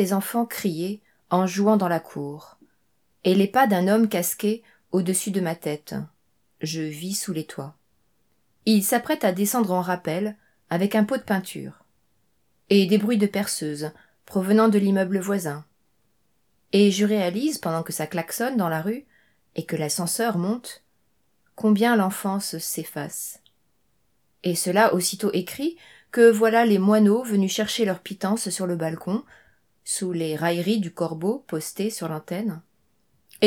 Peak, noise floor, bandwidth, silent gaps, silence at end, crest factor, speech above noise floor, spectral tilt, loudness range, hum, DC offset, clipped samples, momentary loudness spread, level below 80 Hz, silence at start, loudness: -4 dBFS; -71 dBFS; 18 kHz; none; 0 s; 20 dB; 48 dB; -5 dB/octave; 7 LU; none; under 0.1%; under 0.1%; 14 LU; -70 dBFS; 0 s; -23 LUFS